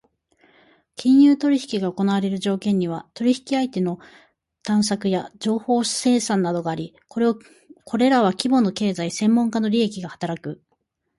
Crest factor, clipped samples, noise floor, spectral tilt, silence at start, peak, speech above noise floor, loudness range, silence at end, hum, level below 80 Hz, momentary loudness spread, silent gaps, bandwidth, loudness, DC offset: 20 dB; under 0.1%; -72 dBFS; -5.5 dB/octave; 1 s; -2 dBFS; 51 dB; 3 LU; 0.65 s; none; -64 dBFS; 12 LU; none; 11.5 kHz; -21 LUFS; under 0.1%